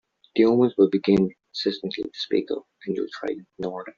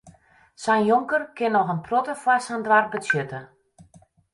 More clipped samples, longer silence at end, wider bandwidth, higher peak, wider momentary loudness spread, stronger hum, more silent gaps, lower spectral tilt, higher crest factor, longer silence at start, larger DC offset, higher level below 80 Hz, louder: neither; second, 0.1 s vs 0.9 s; second, 7.2 kHz vs 11.5 kHz; about the same, -6 dBFS vs -6 dBFS; first, 13 LU vs 6 LU; neither; neither; about the same, -5.5 dB/octave vs -5.5 dB/octave; about the same, 18 dB vs 18 dB; first, 0.35 s vs 0.05 s; neither; about the same, -62 dBFS vs -66 dBFS; about the same, -24 LUFS vs -22 LUFS